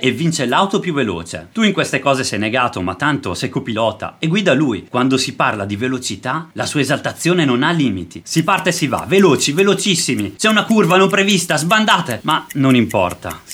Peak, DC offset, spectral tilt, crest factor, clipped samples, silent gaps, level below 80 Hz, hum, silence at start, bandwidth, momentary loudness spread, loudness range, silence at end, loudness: 0 dBFS; under 0.1%; -4.5 dB/octave; 16 dB; under 0.1%; none; -54 dBFS; none; 0 s; 17 kHz; 8 LU; 4 LU; 0 s; -16 LUFS